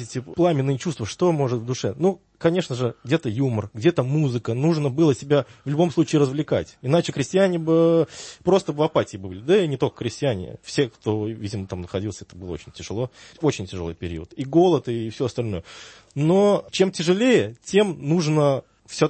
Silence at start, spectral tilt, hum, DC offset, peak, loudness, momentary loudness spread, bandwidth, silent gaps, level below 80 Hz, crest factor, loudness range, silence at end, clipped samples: 0 s; -6.5 dB/octave; none; under 0.1%; -6 dBFS; -22 LUFS; 12 LU; 8.8 kHz; none; -54 dBFS; 16 dB; 7 LU; 0 s; under 0.1%